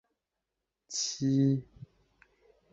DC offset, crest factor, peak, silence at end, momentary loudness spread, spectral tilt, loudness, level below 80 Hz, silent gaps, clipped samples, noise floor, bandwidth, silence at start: under 0.1%; 18 dB; -16 dBFS; 0.9 s; 8 LU; -5.5 dB/octave; -30 LUFS; -68 dBFS; none; under 0.1%; -87 dBFS; 8 kHz; 0.9 s